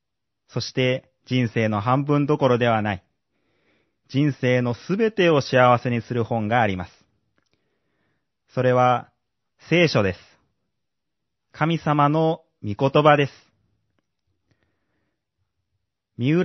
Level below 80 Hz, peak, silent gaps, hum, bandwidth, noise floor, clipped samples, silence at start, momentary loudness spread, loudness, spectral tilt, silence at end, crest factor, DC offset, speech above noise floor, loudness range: -64 dBFS; -2 dBFS; none; none; 6.2 kHz; -83 dBFS; under 0.1%; 0.55 s; 11 LU; -21 LUFS; -7 dB/octave; 0 s; 22 dB; under 0.1%; 63 dB; 4 LU